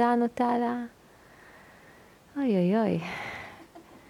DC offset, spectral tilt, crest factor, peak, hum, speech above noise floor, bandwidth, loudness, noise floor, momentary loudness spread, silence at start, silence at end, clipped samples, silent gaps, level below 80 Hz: under 0.1%; -7.5 dB/octave; 16 dB; -12 dBFS; none; 28 dB; 13 kHz; -28 LUFS; -55 dBFS; 18 LU; 0 s; 0.1 s; under 0.1%; none; -66 dBFS